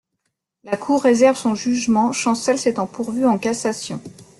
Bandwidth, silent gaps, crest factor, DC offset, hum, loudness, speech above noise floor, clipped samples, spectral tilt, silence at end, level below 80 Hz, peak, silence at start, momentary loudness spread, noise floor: 12 kHz; none; 16 dB; under 0.1%; none; -19 LUFS; 57 dB; under 0.1%; -4.5 dB/octave; 0.15 s; -60 dBFS; -2 dBFS; 0.65 s; 12 LU; -75 dBFS